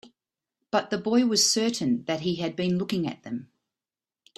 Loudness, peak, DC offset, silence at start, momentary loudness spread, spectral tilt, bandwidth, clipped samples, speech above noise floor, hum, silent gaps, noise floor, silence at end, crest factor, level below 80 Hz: -25 LUFS; -8 dBFS; under 0.1%; 0.05 s; 12 LU; -3.5 dB/octave; 13.5 kHz; under 0.1%; over 64 dB; none; none; under -90 dBFS; 0.95 s; 20 dB; -68 dBFS